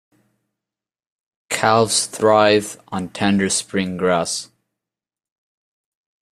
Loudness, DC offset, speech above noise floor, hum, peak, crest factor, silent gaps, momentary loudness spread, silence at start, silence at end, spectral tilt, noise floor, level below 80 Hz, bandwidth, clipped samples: -18 LUFS; under 0.1%; 71 dB; none; 0 dBFS; 20 dB; none; 12 LU; 1.5 s; 1.9 s; -3.5 dB/octave; -89 dBFS; -60 dBFS; 15 kHz; under 0.1%